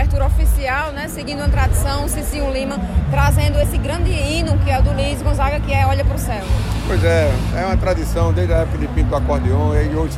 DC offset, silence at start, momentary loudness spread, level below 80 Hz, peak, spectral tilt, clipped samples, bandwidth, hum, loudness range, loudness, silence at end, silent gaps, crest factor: under 0.1%; 0 s; 5 LU; -20 dBFS; -4 dBFS; -6 dB/octave; under 0.1%; 15.5 kHz; none; 1 LU; -18 LUFS; 0 s; none; 12 dB